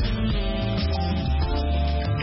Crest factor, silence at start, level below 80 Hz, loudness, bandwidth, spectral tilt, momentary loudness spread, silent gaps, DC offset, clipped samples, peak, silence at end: 12 dB; 0 s; -26 dBFS; -25 LUFS; 5.8 kHz; -10.5 dB/octave; 1 LU; none; under 0.1%; under 0.1%; -12 dBFS; 0 s